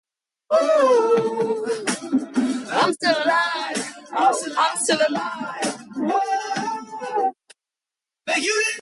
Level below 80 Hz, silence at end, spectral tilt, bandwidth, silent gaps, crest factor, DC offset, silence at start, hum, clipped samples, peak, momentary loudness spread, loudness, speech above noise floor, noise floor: -72 dBFS; 0 s; -2.5 dB/octave; 11.5 kHz; none; 16 dB; under 0.1%; 0.5 s; none; under 0.1%; -6 dBFS; 10 LU; -21 LUFS; 67 dB; -88 dBFS